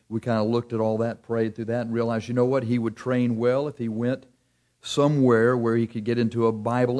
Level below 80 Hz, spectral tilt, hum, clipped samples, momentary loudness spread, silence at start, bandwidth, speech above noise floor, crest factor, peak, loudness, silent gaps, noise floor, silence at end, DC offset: -64 dBFS; -7.5 dB/octave; none; under 0.1%; 8 LU; 0.1 s; 11 kHz; 44 dB; 16 dB; -8 dBFS; -24 LUFS; none; -68 dBFS; 0 s; under 0.1%